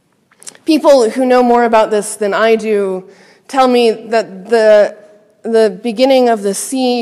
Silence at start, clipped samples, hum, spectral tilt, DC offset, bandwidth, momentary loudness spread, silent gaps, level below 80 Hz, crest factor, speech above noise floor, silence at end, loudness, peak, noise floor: 0.65 s; under 0.1%; none; -4 dB/octave; under 0.1%; 14.5 kHz; 8 LU; none; -58 dBFS; 12 dB; 27 dB; 0 s; -12 LUFS; 0 dBFS; -38 dBFS